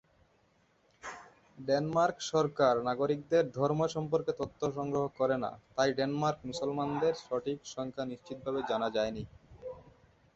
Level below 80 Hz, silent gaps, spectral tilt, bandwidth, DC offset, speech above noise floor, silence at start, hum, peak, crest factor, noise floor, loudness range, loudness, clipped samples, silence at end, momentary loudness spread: -64 dBFS; none; -5.5 dB/octave; 8 kHz; under 0.1%; 38 dB; 1.05 s; none; -12 dBFS; 20 dB; -70 dBFS; 4 LU; -32 LUFS; under 0.1%; 0.55 s; 18 LU